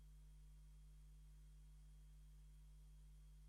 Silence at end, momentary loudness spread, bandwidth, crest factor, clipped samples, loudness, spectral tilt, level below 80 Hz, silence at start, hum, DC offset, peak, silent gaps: 0 s; 0 LU; 12.5 kHz; 6 dB; under 0.1%; -67 LUFS; -5.5 dB/octave; -64 dBFS; 0 s; 50 Hz at -65 dBFS; under 0.1%; -58 dBFS; none